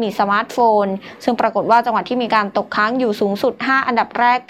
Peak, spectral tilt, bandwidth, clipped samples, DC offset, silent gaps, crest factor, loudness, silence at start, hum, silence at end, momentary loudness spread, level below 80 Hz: -2 dBFS; -5.5 dB/octave; 16 kHz; under 0.1%; under 0.1%; none; 14 dB; -17 LUFS; 0 s; none; 0.1 s; 5 LU; -64 dBFS